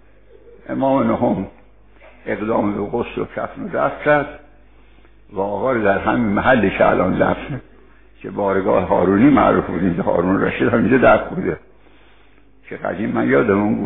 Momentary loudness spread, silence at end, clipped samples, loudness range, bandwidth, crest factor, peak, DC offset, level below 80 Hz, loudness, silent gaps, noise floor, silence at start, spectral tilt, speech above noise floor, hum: 15 LU; 0 s; under 0.1%; 6 LU; 4 kHz; 16 dB; -2 dBFS; 0.4%; -44 dBFS; -17 LUFS; none; -52 dBFS; 0.7 s; -6 dB/octave; 35 dB; 50 Hz at -45 dBFS